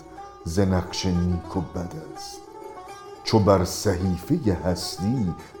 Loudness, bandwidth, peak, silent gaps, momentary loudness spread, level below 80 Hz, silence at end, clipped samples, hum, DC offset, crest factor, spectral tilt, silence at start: -24 LUFS; 20 kHz; -2 dBFS; none; 19 LU; -44 dBFS; 0 s; under 0.1%; none; under 0.1%; 22 dB; -6 dB/octave; 0 s